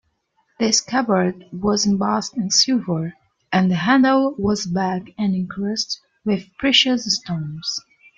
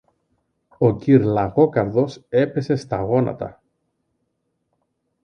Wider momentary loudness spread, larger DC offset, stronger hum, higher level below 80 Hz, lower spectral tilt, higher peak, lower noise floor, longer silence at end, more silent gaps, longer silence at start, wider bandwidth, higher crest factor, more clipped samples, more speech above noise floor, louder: first, 11 LU vs 8 LU; neither; neither; about the same, -54 dBFS vs -52 dBFS; second, -3.5 dB/octave vs -9 dB/octave; about the same, -2 dBFS vs -2 dBFS; second, -67 dBFS vs -73 dBFS; second, 0.4 s vs 1.7 s; neither; second, 0.6 s vs 0.8 s; about the same, 9 kHz vs 9.2 kHz; about the same, 18 dB vs 18 dB; neither; second, 47 dB vs 54 dB; about the same, -19 LUFS vs -19 LUFS